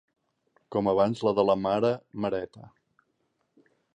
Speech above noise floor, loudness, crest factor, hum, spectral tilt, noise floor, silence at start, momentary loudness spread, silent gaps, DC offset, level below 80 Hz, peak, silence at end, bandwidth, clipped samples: 49 dB; -27 LUFS; 20 dB; none; -7.5 dB/octave; -75 dBFS; 0.7 s; 9 LU; none; under 0.1%; -62 dBFS; -10 dBFS; 1.25 s; 9.6 kHz; under 0.1%